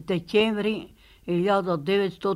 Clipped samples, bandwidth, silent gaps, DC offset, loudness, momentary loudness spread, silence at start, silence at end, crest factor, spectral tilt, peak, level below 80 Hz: under 0.1%; 12.5 kHz; none; under 0.1%; -25 LUFS; 8 LU; 0 s; 0 s; 16 dB; -7 dB/octave; -8 dBFS; -58 dBFS